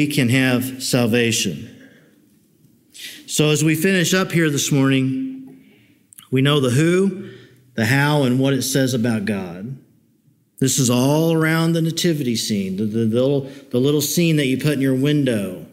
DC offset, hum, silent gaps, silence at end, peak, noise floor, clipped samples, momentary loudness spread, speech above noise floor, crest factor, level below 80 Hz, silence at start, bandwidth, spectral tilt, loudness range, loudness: under 0.1%; none; none; 0.05 s; -4 dBFS; -59 dBFS; under 0.1%; 10 LU; 41 dB; 16 dB; -62 dBFS; 0 s; 16 kHz; -5 dB/octave; 2 LU; -18 LUFS